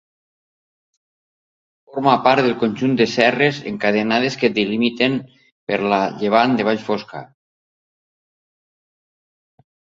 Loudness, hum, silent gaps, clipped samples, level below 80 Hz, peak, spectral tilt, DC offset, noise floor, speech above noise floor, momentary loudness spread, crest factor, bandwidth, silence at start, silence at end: -18 LUFS; none; 5.52-5.67 s; under 0.1%; -62 dBFS; 0 dBFS; -5.5 dB/octave; under 0.1%; under -90 dBFS; over 72 dB; 10 LU; 20 dB; 7.6 kHz; 1.95 s; 2.75 s